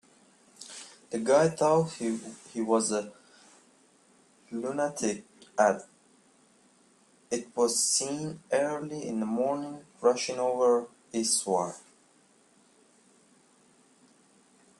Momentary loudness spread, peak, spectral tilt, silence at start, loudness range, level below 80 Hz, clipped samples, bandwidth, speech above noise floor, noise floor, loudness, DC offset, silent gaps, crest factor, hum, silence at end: 16 LU; -10 dBFS; -3.5 dB/octave; 0.6 s; 5 LU; -76 dBFS; under 0.1%; 14 kHz; 35 dB; -63 dBFS; -29 LUFS; under 0.1%; none; 20 dB; none; 3 s